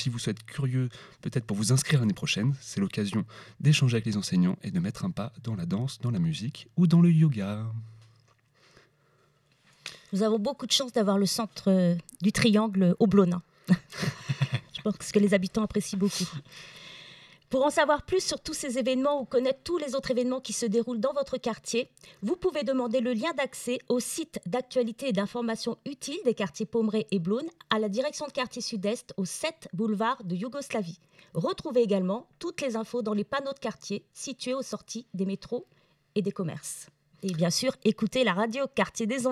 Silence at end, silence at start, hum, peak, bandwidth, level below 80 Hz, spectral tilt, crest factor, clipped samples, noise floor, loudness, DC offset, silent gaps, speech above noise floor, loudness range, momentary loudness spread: 0 s; 0 s; none; -6 dBFS; 14 kHz; -62 dBFS; -5.5 dB/octave; 22 dB; under 0.1%; -66 dBFS; -28 LUFS; under 0.1%; none; 38 dB; 6 LU; 12 LU